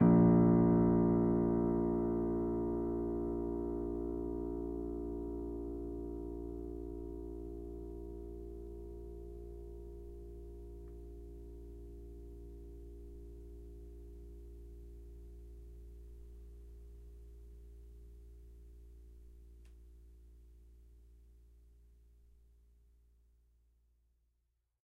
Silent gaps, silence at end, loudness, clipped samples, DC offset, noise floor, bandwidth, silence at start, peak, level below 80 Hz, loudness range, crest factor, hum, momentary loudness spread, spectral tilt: none; 3.4 s; -35 LUFS; under 0.1%; under 0.1%; -82 dBFS; 2.4 kHz; 0 s; -16 dBFS; -50 dBFS; 24 LU; 22 dB; none; 26 LU; -12 dB/octave